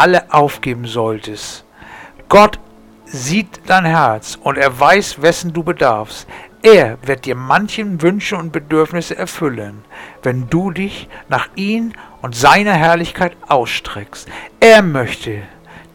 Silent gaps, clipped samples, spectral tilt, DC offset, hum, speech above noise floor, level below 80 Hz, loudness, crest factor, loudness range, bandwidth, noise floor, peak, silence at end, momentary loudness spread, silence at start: none; 0.2%; -5 dB/octave; under 0.1%; none; 23 dB; -44 dBFS; -14 LUFS; 14 dB; 6 LU; 18.5 kHz; -37 dBFS; 0 dBFS; 0.15 s; 20 LU; 0 s